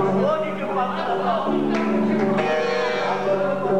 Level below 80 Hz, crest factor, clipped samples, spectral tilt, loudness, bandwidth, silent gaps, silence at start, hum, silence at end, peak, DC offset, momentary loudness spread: -58 dBFS; 12 dB; under 0.1%; -6.5 dB/octave; -22 LUFS; 9.6 kHz; none; 0 s; none; 0 s; -10 dBFS; 1%; 3 LU